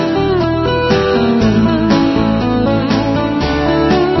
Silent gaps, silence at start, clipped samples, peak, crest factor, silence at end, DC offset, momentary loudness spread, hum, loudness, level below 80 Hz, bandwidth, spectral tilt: none; 0 s; under 0.1%; 0 dBFS; 12 dB; 0 s; under 0.1%; 3 LU; none; -13 LUFS; -30 dBFS; 6.2 kHz; -7 dB/octave